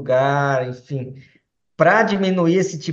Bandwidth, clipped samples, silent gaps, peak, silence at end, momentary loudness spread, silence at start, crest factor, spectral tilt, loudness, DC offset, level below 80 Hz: 7.8 kHz; under 0.1%; none; -2 dBFS; 0 s; 14 LU; 0 s; 18 dB; -6 dB/octave; -18 LUFS; under 0.1%; -64 dBFS